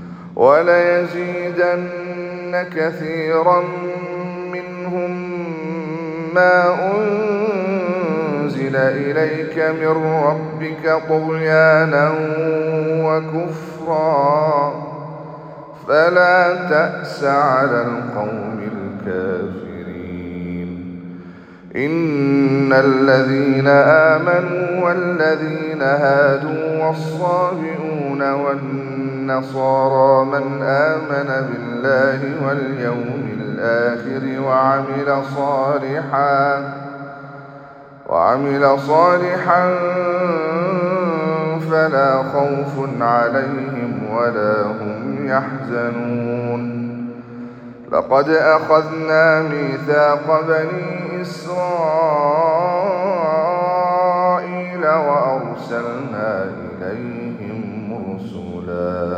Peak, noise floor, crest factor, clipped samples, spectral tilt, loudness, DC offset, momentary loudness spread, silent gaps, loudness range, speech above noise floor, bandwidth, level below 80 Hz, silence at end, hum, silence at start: 0 dBFS; -39 dBFS; 16 dB; under 0.1%; -8 dB/octave; -17 LUFS; under 0.1%; 14 LU; none; 6 LU; 22 dB; 8.6 kHz; -62 dBFS; 0 s; none; 0 s